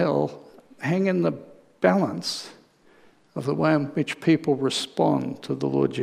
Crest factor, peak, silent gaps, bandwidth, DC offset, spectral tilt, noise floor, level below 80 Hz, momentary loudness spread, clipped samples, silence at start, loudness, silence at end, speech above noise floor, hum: 22 dB; -4 dBFS; none; 14.5 kHz; under 0.1%; -6 dB/octave; -56 dBFS; -70 dBFS; 10 LU; under 0.1%; 0 s; -24 LUFS; 0 s; 32 dB; none